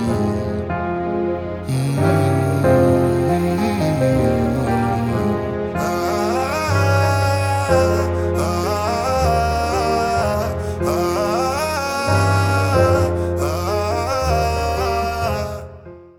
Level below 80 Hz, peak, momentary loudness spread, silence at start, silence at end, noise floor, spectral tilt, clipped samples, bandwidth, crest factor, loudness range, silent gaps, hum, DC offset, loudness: -36 dBFS; -4 dBFS; 6 LU; 0 s; 0.1 s; -39 dBFS; -6.5 dB/octave; under 0.1%; 17.5 kHz; 14 dB; 2 LU; none; none; under 0.1%; -19 LUFS